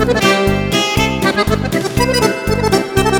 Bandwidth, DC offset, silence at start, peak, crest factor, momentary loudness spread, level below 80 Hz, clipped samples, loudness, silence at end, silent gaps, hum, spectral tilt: 19.5 kHz; under 0.1%; 0 s; 0 dBFS; 14 dB; 4 LU; -28 dBFS; under 0.1%; -14 LUFS; 0 s; none; none; -4.5 dB/octave